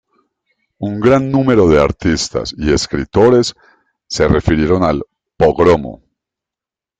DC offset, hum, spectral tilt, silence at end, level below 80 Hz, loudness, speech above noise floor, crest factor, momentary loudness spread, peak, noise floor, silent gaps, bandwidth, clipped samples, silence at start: under 0.1%; none; -6 dB/octave; 1.05 s; -32 dBFS; -13 LUFS; 75 dB; 14 dB; 12 LU; 0 dBFS; -88 dBFS; none; 9.4 kHz; under 0.1%; 0.8 s